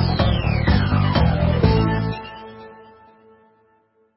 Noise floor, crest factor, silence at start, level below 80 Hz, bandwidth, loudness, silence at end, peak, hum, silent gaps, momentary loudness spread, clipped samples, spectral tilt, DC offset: -61 dBFS; 18 dB; 0 s; -28 dBFS; 5.8 kHz; -19 LUFS; 1.45 s; -4 dBFS; none; none; 20 LU; under 0.1%; -11.5 dB/octave; under 0.1%